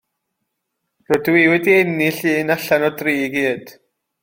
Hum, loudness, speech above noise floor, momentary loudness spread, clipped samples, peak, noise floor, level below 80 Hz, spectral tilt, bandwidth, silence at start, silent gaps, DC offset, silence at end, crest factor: none; -16 LUFS; 59 dB; 7 LU; under 0.1%; -2 dBFS; -76 dBFS; -60 dBFS; -5.5 dB/octave; 16.5 kHz; 1.1 s; none; under 0.1%; 0.5 s; 18 dB